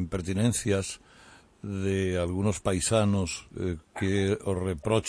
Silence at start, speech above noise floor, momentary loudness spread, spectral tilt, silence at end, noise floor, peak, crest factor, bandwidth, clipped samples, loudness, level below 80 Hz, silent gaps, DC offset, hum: 0 s; 27 dB; 9 LU; -5.5 dB/octave; 0 s; -55 dBFS; -12 dBFS; 18 dB; 11 kHz; under 0.1%; -28 LUFS; -50 dBFS; none; under 0.1%; none